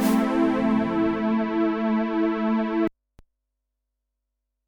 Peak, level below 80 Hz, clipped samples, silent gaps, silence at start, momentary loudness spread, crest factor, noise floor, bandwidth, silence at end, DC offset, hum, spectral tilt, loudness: -10 dBFS; -54 dBFS; under 0.1%; none; 0 s; 3 LU; 14 dB; -81 dBFS; 19 kHz; 1.8 s; under 0.1%; 50 Hz at -65 dBFS; -6.5 dB/octave; -23 LUFS